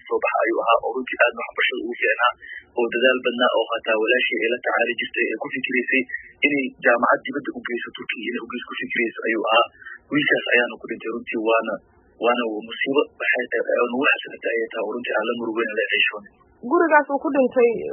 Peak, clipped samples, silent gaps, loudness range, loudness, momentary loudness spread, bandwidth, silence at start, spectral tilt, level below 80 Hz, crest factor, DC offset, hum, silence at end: -2 dBFS; under 0.1%; none; 2 LU; -21 LUFS; 10 LU; 3.4 kHz; 0.05 s; 2.5 dB/octave; -68 dBFS; 20 dB; under 0.1%; none; 0 s